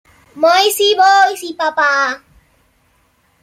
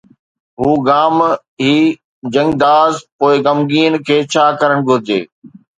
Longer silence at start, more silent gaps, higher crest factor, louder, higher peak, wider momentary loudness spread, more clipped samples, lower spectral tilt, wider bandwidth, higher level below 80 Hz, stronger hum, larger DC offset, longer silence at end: second, 0.35 s vs 0.6 s; second, none vs 1.48-1.57 s, 2.04-2.22 s, 3.12-3.19 s, 5.32-5.42 s; about the same, 14 dB vs 14 dB; about the same, -12 LUFS vs -13 LUFS; about the same, -2 dBFS vs 0 dBFS; about the same, 10 LU vs 8 LU; neither; second, 0 dB/octave vs -5.5 dB/octave; first, 16 kHz vs 9.2 kHz; second, -60 dBFS vs -50 dBFS; neither; neither; first, 1.25 s vs 0.3 s